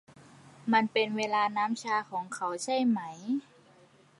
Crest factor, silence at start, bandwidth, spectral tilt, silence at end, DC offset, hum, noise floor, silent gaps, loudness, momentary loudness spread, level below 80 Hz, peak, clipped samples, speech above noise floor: 22 dB; 0.2 s; 11.5 kHz; -4 dB/octave; 0.8 s; under 0.1%; none; -60 dBFS; none; -30 LUFS; 8 LU; -82 dBFS; -10 dBFS; under 0.1%; 30 dB